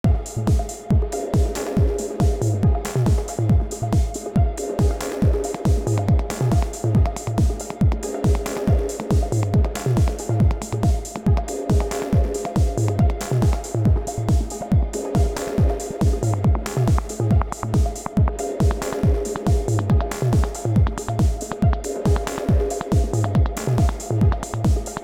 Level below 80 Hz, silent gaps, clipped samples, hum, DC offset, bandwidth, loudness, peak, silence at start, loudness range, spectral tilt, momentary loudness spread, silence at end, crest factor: -24 dBFS; none; under 0.1%; none; under 0.1%; 16.5 kHz; -22 LUFS; -6 dBFS; 0.05 s; 0 LU; -7 dB/octave; 2 LU; 0 s; 12 dB